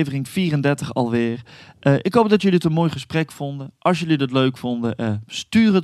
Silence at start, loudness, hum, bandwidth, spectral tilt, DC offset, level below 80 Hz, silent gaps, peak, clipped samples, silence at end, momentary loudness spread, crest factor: 0 s; -20 LUFS; none; 13 kHz; -6.5 dB/octave; under 0.1%; -56 dBFS; none; -2 dBFS; under 0.1%; 0 s; 9 LU; 18 dB